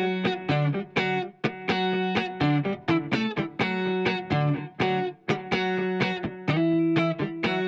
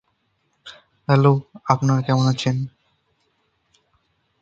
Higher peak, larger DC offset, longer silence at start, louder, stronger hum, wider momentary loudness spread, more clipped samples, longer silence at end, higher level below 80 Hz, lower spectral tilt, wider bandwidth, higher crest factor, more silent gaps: second, -10 dBFS vs 0 dBFS; neither; second, 0 s vs 0.65 s; second, -26 LUFS vs -19 LUFS; neither; second, 4 LU vs 24 LU; neither; second, 0 s vs 1.75 s; about the same, -60 dBFS vs -58 dBFS; about the same, -7 dB/octave vs -7 dB/octave; about the same, 7.6 kHz vs 7.8 kHz; second, 16 dB vs 22 dB; neither